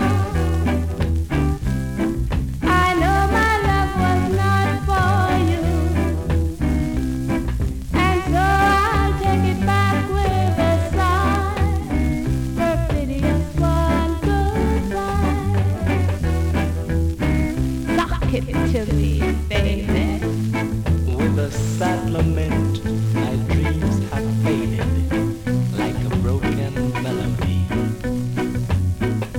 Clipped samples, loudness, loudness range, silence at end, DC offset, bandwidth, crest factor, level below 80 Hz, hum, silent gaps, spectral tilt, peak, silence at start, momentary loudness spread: under 0.1%; -20 LUFS; 3 LU; 0 s; under 0.1%; 17 kHz; 14 dB; -26 dBFS; none; none; -7 dB/octave; -6 dBFS; 0 s; 5 LU